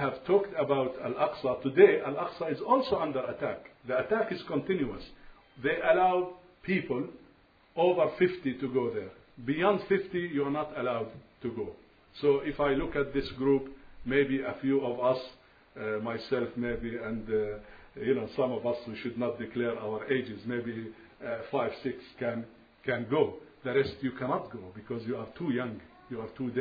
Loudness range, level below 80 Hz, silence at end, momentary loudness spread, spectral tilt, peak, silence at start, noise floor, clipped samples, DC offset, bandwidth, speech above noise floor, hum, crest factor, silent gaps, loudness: 6 LU; -56 dBFS; 0 s; 14 LU; -5 dB/octave; -8 dBFS; 0 s; -61 dBFS; under 0.1%; under 0.1%; 5 kHz; 31 dB; none; 24 dB; none; -31 LUFS